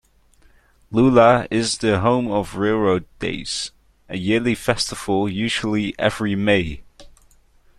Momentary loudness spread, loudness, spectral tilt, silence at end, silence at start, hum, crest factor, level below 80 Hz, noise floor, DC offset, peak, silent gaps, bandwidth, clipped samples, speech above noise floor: 12 LU; -20 LUFS; -5 dB/octave; 0.7 s; 0.9 s; none; 18 dB; -46 dBFS; -54 dBFS; under 0.1%; -2 dBFS; none; 13 kHz; under 0.1%; 35 dB